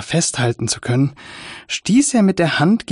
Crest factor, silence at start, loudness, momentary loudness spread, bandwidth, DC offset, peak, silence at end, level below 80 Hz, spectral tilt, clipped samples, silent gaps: 12 dB; 0 s; -17 LUFS; 14 LU; 11 kHz; under 0.1%; -6 dBFS; 0 s; -52 dBFS; -4.5 dB/octave; under 0.1%; none